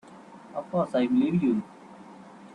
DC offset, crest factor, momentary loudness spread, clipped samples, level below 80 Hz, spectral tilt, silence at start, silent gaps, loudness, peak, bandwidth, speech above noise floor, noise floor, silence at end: under 0.1%; 14 dB; 24 LU; under 0.1%; -66 dBFS; -8.5 dB/octave; 0.1 s; none; -26 LUFS; -14 dBFS; 9.8 kHz; 23 dB; -48 dBFS; 0 s